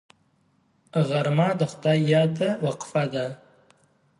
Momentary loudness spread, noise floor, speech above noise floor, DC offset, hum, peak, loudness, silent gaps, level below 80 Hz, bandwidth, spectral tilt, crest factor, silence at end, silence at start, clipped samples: 10 LU; -65 dBFS; 42 dB; under 0.1%; none; -8 dBFS; -24 LUFS; none; -68 dBFS; 11.5 kHz; -7 dB/octave; 18 dB; 0.85 s; 0.95 s; under 0.1%